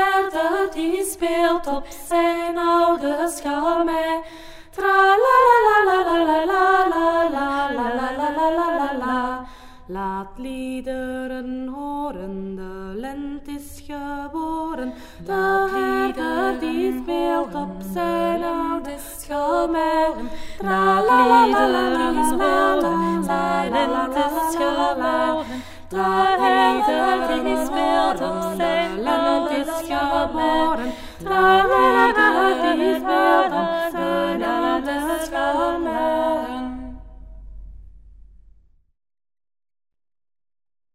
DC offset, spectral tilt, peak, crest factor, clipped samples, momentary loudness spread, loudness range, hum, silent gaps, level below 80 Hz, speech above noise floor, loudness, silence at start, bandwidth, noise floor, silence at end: under 0.1%; -4.5 dB/octave; -4 dBFS; 18 dB; under 0.1%; 15 LU; 12 LU; none; none; -44 dBFS; 33 dB; -20 LUFS; 0 s; 16 kHz; -52 dBFS; 2.95 s